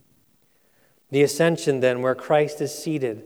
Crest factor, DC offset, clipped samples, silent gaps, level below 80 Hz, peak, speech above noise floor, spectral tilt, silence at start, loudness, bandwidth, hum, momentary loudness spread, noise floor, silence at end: 16 dB; under 0.1%; under 0.1%; none; -78 dBFS; -6 dBFS; 42 dB; -5 dB/octave; 1.1 s; -22 LUFS; over 20 kHz; none; 7 LU; -63 dBFS; 0 s